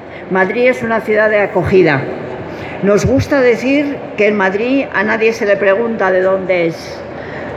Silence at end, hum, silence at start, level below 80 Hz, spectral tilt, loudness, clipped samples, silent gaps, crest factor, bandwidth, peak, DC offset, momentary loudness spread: 0 s; none; 0 s; -42 dBFS; -6 dB/octave; -13 LUFS; under 0.1%; none; 14 dB; 13.5 kHz; 0 dBFS; under 0.1%; 13 LU